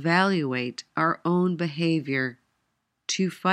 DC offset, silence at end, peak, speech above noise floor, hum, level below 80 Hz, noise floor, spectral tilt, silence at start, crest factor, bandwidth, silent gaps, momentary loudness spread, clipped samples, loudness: under 0.1%; 0 s; -8 dBFS; 52 dB; none; -76 dBFS; -76 dBFS; -5 dB/octave; 0 s; 18 dB; 10.5 kHz; none; 8 LU; under 0.1%; -26 LUFS